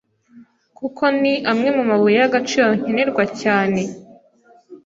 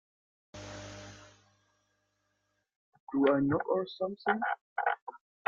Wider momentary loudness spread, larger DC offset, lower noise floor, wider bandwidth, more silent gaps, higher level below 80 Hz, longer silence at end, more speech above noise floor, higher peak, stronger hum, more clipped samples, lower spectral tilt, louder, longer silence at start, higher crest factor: second, 8 LU vs 21 LU; neither; second, -52 dBFS vs -79 dBFS; about the same, 7.8 kHz vs 7.4 kHz; second, none vs 2.76-2.92 s, 3.00-3.07 s, 4.61-4.76 s, 5.02-5.07 s; first, -62 dBFS vs -68 dBFS; second, 0.1 s vs 0.3 s; second, 35 dB vs 50 dB; first, -2 dBFS vs -14 dBFS; second, none vs 50 Hz at -65 dBFS; neither; second, -5 dB/octave vs -6.5 dB/octave; first, -17 LUFS vs -32 LUFS; second, 0.35 s vs 0.55 s; second, 16 dB vs 22 dB